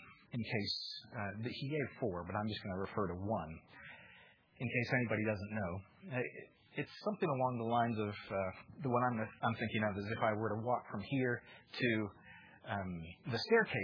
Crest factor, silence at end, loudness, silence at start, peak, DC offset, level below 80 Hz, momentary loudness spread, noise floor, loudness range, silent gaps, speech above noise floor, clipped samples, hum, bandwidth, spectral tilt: 20 dB; 0 s; -39 LUFS; 0 s; -18 dBFS; under 0.1%; -70 dBFS; 13 LU; -64 dBFS; 4 LU; none; 25 dB; under 0.1%; none; 5.4 kHz; -4.5 dB/octave